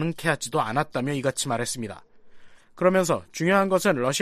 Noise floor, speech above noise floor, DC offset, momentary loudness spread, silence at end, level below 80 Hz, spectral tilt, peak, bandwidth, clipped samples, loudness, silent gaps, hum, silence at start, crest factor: -45 dBFS; 21 dB; under 0.1%; 8 LU; 0 s; -60 dBFS; -4.5 dB/octave; -6 dBFS; 15 kHz; under 0.1%; -24 LUFS; none; none; 0 s; 18 dB